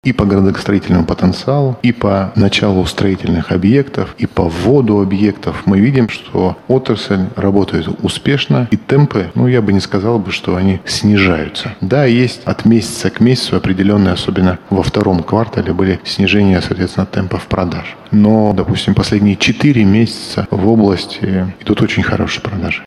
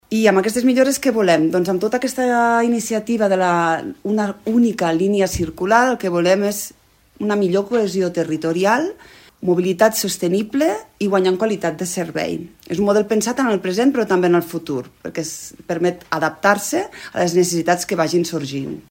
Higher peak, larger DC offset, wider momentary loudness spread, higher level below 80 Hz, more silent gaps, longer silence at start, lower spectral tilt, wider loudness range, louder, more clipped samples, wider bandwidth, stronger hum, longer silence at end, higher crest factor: about the same, 0 dBFS vs 0 dBFS; neither; second, 7 LU vs 10 LU; first, -36 dBFS vs -50 dBFS; neither; about the same, 0.05 s vs 0.1 s; first, -6.5 dB/octave vs -5 dB/octave; about the same, 2 LU vs 3 LU; first, -13 LUFS vs -18 LUFS; neither; second, 12 kHz vs 16.5 kHz; neither; about the same, 0 s vs 0.1 s; second, 12 dB vs 18 dB